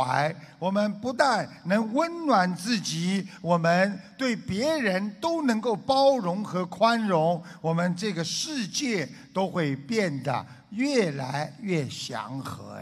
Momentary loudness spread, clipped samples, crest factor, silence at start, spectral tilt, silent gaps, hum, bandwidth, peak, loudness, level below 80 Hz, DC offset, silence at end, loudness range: 9 LU; under 0.1%; 20 dB; 0 s; -5 dB/octave; none; none; 14 kHz; -6 dBFS; -26 LUFS; -66 dBFS; under 0.1%; 0 s; 4 LU